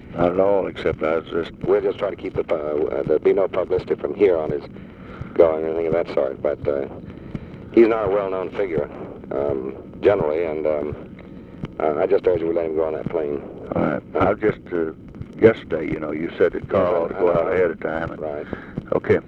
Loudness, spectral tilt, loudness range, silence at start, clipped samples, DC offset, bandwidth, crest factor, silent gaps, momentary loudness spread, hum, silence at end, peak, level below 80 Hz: -22 LUFS; -9 dB/octave; 3 LU; 0 s; under 0.1%; under 0.1%; 6 kHz; 20 dB; none; 15 LU; none; 0 s; 0 dBFS; -46 dBFS